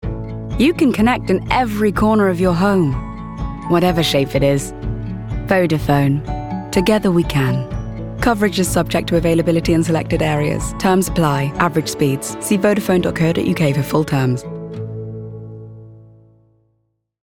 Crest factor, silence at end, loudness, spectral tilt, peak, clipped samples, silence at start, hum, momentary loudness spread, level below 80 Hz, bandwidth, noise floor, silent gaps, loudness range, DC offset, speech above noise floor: 16 dB; 1.25 s; -17 LUFS; -6 dB/octave; -2 dBFS; under 0.1%; 0 s; none; 13 LU; -32 dBFS; 18.5 kHz; -67 dBFS; none; 3 LU; under 0.1%; 52 dB